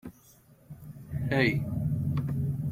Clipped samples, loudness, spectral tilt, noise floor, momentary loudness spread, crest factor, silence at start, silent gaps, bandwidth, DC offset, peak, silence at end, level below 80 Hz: under 0.1%; -30 LUFS; -7.5 dB/octave; -58 dBFS; 22 LU; 20 dB; 0.05 s; none; 15.5 kHz; under 0.1%; -12 dBFS; 0 s; -52 dBFS